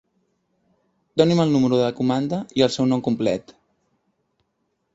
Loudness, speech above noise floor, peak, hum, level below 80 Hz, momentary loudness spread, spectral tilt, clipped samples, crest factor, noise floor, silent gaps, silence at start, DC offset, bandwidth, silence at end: -21 LUFS; 53 dB; -2 dBFS; none; -60 dBFS; 7 LU; -6.5 dB/octave; under 0.1%; 20 dB; -73 dBFS; none; 1.15 s; under 0.1%; 8 kHz; 1.55 s